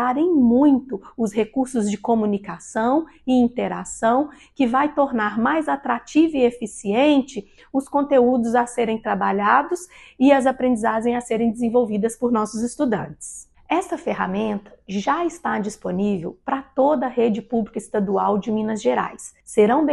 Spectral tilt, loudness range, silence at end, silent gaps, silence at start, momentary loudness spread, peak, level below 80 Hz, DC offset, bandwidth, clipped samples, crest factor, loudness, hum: -5.5 dB/octave; 5 LU; 0 s; none; 0 s; 10 LU; -2 dBFS; -54 dBFS; under 0.1%; 12 kHz; under 0.1%; 18 dB; -21 LUFS; none